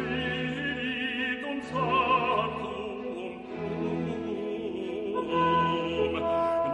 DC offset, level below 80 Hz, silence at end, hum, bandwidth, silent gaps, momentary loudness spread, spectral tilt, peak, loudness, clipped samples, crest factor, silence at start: under 0.1%; -54 dBFS; 0 s; none; 11 kHz; none; 11 LU; -6.5 dB/octave; -12 dBFS; -29 LUFS; under 0.1%; 16 dB; 0 s